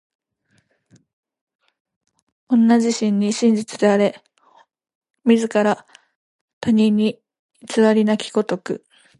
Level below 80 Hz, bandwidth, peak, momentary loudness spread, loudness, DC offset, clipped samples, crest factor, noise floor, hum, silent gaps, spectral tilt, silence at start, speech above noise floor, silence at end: -66 dBFS; 11.5 kHz; -2 dBFS; 11 LU; -18 LUFS; under 0.1%; under 0.1%; 18 dB; -65 dBFS; none; 4.95-5.01 s, 6.16-6.61 s, 7.39-7.49 s; -5.5 dB/octave; 2.5 s; 48 dB; 0.45 s